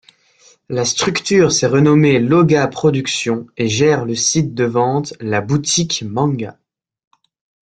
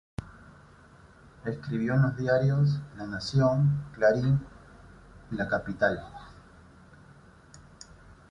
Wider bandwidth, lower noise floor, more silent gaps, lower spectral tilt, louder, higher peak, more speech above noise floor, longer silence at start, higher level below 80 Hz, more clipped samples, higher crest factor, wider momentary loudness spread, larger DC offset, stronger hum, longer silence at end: first, 9.4 kHz vs 7.6 kHz; about the same, -51 dBFS vs -54 dBFS; neither; second, -4.5 dB/octave vs -7.5 dB/octave; first, -15 LUFS vs -28 LUFS; first, -2 dBFS vs -10 dBFS; first, 36 dB vs 28 dB; first, 0.7 s vs 0.2 s; about the same, -52 dBFS vs -54 dBFS; neither; about the same, 14 dB vs 18 dB; second, 8 LU vs 24 LU; neither; neither; first, 1.15 s vs 0.7 s